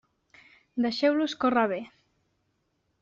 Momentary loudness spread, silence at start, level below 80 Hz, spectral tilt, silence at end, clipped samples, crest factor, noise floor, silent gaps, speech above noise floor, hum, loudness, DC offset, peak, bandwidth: 13 LU; 0.75 s; -70 dBFS; -2.5 dB/octave; 1.15 s; under 0.1%; 18 dB; -75 dBFS; none; 49 dB; none; -27 LUFS; under 0.1%; -10 dBFS; 7.6 kHz